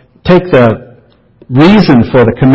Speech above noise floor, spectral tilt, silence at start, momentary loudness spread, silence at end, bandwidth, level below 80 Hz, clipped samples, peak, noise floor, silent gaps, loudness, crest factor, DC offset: 37 dB; -9 dB/octave; 0.25 s; 7 LU; 0 s; 8 kHz; -34 dBFS; 2%; 0 dBFS; -42 dBFS; none; -7 LUFS; 8 dB; under 0.1%